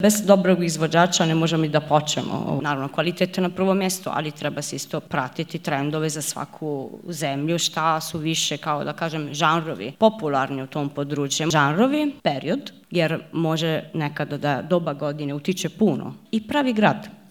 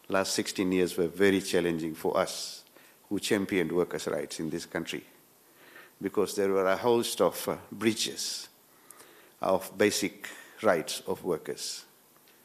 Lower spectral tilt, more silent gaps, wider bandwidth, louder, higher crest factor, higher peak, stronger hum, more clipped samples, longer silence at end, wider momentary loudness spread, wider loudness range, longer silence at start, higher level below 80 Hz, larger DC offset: about the same, -4.5 dB/octave vs -4 dB/octave; neither; first, 18.5 kHz vs 14.5 kHz; first, -23 LUFS vs -30 LUFS; about the same, 22 dB vs 22 dB; first, 0 dBFS vs -8 dBFS; neither; neither; second, 0.15 s vs 0.6 s; about the same, 9 LU vs 11 LU; about the same, 4 LU vs 3 LU; about the same, 0 s vs 0.1 s; about the same, -66 dBFS vs -70 dBFS; first, 0.1% vs under 0.1%